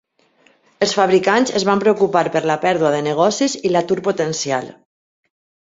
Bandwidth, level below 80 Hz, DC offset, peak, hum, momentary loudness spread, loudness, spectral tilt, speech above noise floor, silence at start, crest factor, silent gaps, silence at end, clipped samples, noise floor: 7.8 kHz; -60 dBFS; under 0.1%; -2 dBFS; none; 7 LU; -17 LUFS; -4 dB/octave; 40 dB; 0.8 s; 16 dB; none; 1.05 s; under 0.1%; -56 dBFS